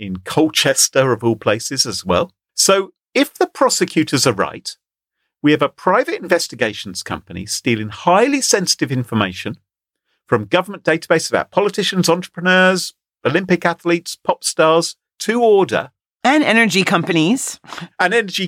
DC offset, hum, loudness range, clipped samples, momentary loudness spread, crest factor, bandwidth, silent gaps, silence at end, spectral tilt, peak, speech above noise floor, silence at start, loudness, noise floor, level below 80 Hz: under 0.1%; none; 3 LU; under 0.1%; 11 LU; 16 dB; 16.5 kHz; none; 0 s; -3.5 dB/octave; -2 dBFS; 60 dB; 0 s; -16 LUFS; -76 dBFS; -56 dBFS